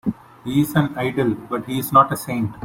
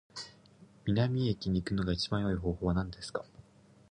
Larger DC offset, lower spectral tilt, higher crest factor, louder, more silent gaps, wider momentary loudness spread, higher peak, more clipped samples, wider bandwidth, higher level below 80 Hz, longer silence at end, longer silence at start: neither; about the same, -6.5 dB/octave vs -6.5 dB/octave; about the same, 18 dB vs 18 dB; first, -20 LUFS vs -33 LUFS; neither; second, 11 LU vs 15 LU; first, -2 dBFS vs -16 dBFS; neither; first, 16.5 kHz vs 10.5 kHz; about the same, -52 dBFS vs -48 dBFS; second, 0 s vs 0.5 s; about the same, 0.05 s vs 0.15 s